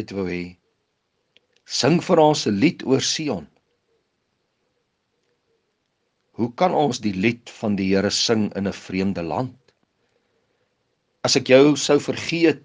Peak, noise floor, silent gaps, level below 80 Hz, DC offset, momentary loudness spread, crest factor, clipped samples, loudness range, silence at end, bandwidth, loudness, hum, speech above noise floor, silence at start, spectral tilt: -2 dBFS; -72 dBFS; none; -64 dBFS; under 0.1%; 12 LU; 20 dB; under 0.1%; 7 LU; 0.05 s; 10 kHz; -20 LUFS; none; 52 dB; 0 s; -4.5 dB/octave